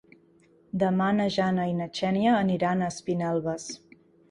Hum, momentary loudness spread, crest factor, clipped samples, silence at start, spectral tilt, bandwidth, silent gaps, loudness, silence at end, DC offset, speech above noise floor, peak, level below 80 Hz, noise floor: none; 12 LU; 16 dB; under 0.1%; 0.75 s; -6 dB/octave; 11 kHz; none; -26 LUFS; 0.55 s; under 0.1%; 34 dB; -12 dBFS; -62 dBFS; -60 dBFS